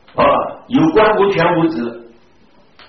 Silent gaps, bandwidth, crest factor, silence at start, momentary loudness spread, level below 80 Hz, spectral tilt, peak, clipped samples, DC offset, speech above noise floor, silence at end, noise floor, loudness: none; 6.2 kHz; 12 dB; 0.15 s; 8 LU; -44 dBFS; -4.5 dB/octave; -2 dBFS; under 0.1%; 0.3%; 38 dB; 0.85 s; -51 dBFS; -14 LUFS